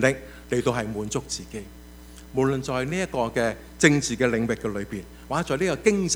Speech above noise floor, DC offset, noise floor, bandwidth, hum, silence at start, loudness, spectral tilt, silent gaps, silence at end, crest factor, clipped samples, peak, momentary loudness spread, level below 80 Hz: 19 dB; under 0.1%; -44 dBFS; over 20 kHz; none; 0 s; -25 LUFS; -4.5 dB/octave; none; 0 s; 22 dB; under 0.1%; -2 dBFS; 15 LU; -46 dBFS